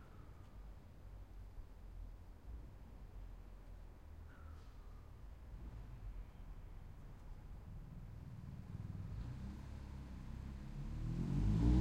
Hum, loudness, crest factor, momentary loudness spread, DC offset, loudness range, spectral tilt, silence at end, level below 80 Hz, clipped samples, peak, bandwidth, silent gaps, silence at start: none; -49 LUFS; 22 dB; 14 LU; under 0.1%; 10 LU; -8.5 dB/octave; 0 s; -48 dBFS; under 0.1%; -24 dBFS; 9.2 kHz; none; 0 s